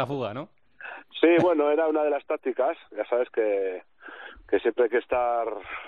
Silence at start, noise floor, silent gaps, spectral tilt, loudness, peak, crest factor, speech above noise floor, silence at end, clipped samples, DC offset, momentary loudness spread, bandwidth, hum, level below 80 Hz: 0 s; -44 dBFS; none; -4 dB/octave; -25 LUFS; -8 dBFS; 18 dB; 20 dB; 0 s; under 0.1%; under 0.1%; 21 LU; 6.8 kHz; none; -64 dBFS